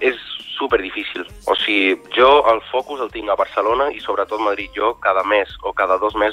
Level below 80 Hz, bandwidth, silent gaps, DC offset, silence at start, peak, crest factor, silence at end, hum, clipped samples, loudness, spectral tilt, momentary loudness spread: -46 dBFS; 13.5 kHz; none; under 0.1%; 0 s; -2 dBFS; 16 dB; 0 s; none; under 0.1%; -18 LUFS; -4 dB/octave; 11 LU